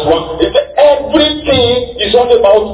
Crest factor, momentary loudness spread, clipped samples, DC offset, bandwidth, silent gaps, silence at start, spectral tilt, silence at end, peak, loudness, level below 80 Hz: 10 dB; 5 LU; 1%; under 0.1%; 4 kHz; none; 0 s; -9 dB/octave; 0 s; 0 dBFS; -10 LUFS; -32 dBFS